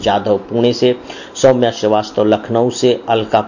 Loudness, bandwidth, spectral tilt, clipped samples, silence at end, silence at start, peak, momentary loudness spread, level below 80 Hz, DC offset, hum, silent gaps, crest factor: -14 LUFS; 7.4 kHz; -5.5 dB/octave; under 0.1%; 0 s; 0 s; 0 dBFS; 4 LU; -48 dBFS; under 0.1%; none; none; 14 dB